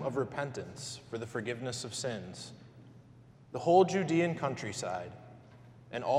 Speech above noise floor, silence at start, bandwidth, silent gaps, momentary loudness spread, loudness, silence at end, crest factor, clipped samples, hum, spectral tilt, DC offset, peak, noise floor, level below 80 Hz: 24 dB; 0 s; 13.5 kHz; none; 20 LU; -33 LUFS; 0 s; 22 dB; under 0.1%; none; -5 dB/octave; under 0.1%; -12 dBFS; -57 dBFS; -70 dBFS